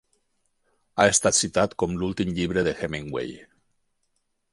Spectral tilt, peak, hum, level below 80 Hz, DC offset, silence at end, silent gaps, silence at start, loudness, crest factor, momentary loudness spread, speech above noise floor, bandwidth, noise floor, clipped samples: -3.5 dB/octave; -2 dBFS; none; -50 dBFS; under 0.1%; 1.1 s; none; 0.95 s; -24 LUFS; 24 dB; 13 LU; 49 dB; 11.5 kHz; -73 dBFS; under 0.1%